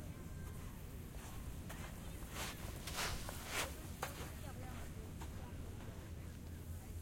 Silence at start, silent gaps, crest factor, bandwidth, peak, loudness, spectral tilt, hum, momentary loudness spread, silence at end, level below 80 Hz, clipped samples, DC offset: 0 s; none; 22 dB; 16.5 kHz; -26 dBFS; -48 LUFS; -4 dB/octave; none; 9 LU; 0 s; -54 dBFS; under 0.1%; under 0.1%